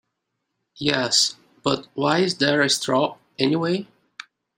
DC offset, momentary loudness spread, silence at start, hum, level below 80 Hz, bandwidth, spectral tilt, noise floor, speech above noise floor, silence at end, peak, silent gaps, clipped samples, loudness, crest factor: under 0.1%; 15 LU; 0.75 s; none; -64 dBFS; 16 kHz; -3.5 dB/octave; -78 dBFS; 57 dB; 0.75 s; -2 dBFS; none; under 0.1%; -21 LUFS; 22 dB